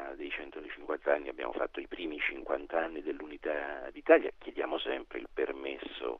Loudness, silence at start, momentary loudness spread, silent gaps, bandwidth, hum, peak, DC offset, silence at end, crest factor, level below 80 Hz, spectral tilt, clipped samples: -34 LUFS; 0 s; 14 LU; none; 5.6 kHz; none; -10 dBFS; under 0.1%; 0 s; 24 dB; -58 dBFS; -5.5 dB/octave; under 0.1%